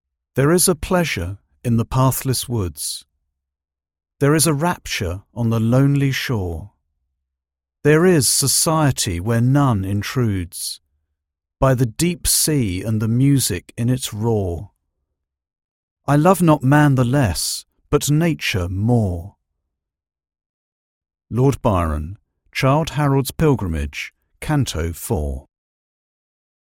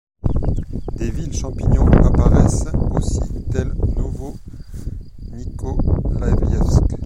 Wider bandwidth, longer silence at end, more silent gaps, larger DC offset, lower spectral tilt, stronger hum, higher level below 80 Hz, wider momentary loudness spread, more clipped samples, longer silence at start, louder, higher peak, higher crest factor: first, 16.5 kHz vs 11 kHz; first, 1.3 s vs 0 s; first, 15.64-15.96 s, 20.46-21.01 s vs none; neither; second, -5 dB/octave vs -7.5 dB/octave; neither; second, -40 dBFS vs -20 dBFS; second, 13 LU vs 19 LU; neither; first, 0.35 s vs 0.2 s; about the same, -18 LUFS vs -19 LUFS; about the same, 0 dBFS vs 0 dBFS; about the same, 20 dB vs 16 dB